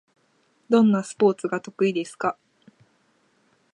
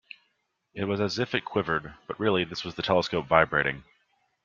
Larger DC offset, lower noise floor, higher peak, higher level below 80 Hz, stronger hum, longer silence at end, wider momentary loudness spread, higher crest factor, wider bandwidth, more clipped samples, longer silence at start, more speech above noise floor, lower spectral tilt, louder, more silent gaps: neither; second, -65 dBFS vs -75 dBFS; second, -6 dBFS vs -2 dBFS; second, -76 dBFS vs -58 dBFS; neither; first, 1.4 s vs 0.65 s; about the same, 10 LU vs 11 LU; second, 18 dB vs 26 dB; first, 11 kHz vs 7.4 kHz; neither; about the same, 0.7 s vs 0.75 s; second, 44 dB vs 48 dB; about the same, -6.5 dB/octave vs -5.5 dB/octave; first, -23 LUFS vs -27 LUFS; neither